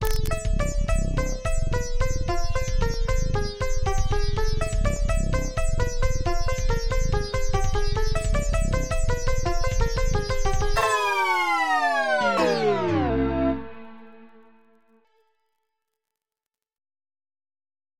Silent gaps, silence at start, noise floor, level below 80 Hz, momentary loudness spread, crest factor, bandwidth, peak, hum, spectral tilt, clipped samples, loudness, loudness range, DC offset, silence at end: none; 0 s; -89 dBFS; -26 dBFS; 6 LU; 16 dB; 15.5 kHz; -6 dBFS; none; -5 dB/octave; under 0.1%; -26 LUFS; 5 LU; under 0.1%; 3.45 s